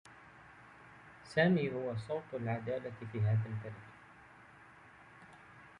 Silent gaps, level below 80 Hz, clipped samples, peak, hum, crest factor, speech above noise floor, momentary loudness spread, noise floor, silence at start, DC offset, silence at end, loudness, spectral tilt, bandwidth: none; -68 dBFS; under 0.1%; -16 dBFS; none; 24 dB; 24 dB; 26 LU; -58 dBFS; 0.05 s; under 0.1%; 0 s; -36 LUFS; -8 dB/octave; 10.5 kHz